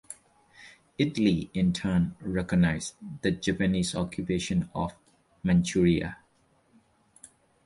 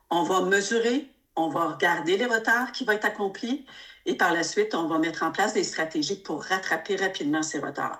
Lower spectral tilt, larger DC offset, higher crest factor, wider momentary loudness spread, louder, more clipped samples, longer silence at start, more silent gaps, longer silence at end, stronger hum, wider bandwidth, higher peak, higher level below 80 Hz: first, -6 dB/octave vs -3 dB/octave; neither; about the same, 18 dB vs 18 dB; about the same, 11 LU vs 9 LU; about the same, -28 LUFS vs -26 LUFS; neither; about the same, 0.1 s vs 0.1 s; neither; first, 1.5 s vs 0 s; neither; second, 11.5 kHz vs 16.5 kHz; second, -12 dBFS vs -8 dBFS; first, -48 dBFS vs -70 dBFS